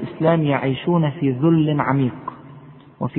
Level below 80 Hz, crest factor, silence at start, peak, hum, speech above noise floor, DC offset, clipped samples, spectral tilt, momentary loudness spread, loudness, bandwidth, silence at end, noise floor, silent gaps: -56 dBFS; 18 dB; 0 s; -2 dBFS; none; 25 dB; under 0.1%; under 0.1%; -12.5 dB/octave; 11 LU; -19 LUFS; 4.1 kHz; 0 s; -43 dBFS; none